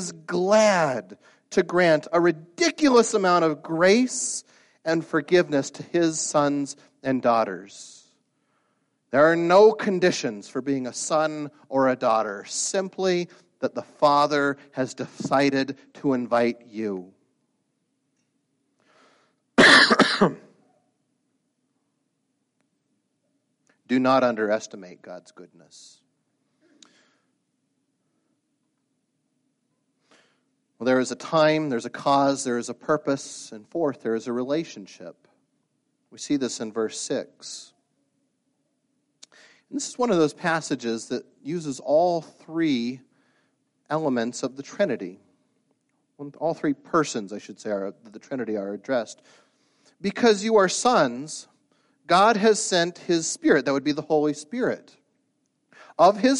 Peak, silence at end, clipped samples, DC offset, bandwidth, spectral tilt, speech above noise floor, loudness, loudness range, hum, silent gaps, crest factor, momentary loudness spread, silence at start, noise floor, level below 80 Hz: -2 dBFS; 0 s; under 0.1%; under 0.1%; 11.5 kHz; -4 dB/octave; 52 dB; -23 LUFS; 11 LU; none; none; 22 dB; 16 LU; 0 s; -75 dBFS; -68 dBFS